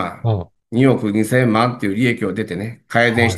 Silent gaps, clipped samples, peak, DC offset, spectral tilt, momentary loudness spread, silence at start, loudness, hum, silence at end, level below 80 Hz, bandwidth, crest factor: none; under 0.1%; 0 dBFS; under 0.1%; -6.5 dB/octave; 9 LU; 0 s; -18 LUFS; none; 0 s; -56 dBFS; 12.5 kHz; 18 dB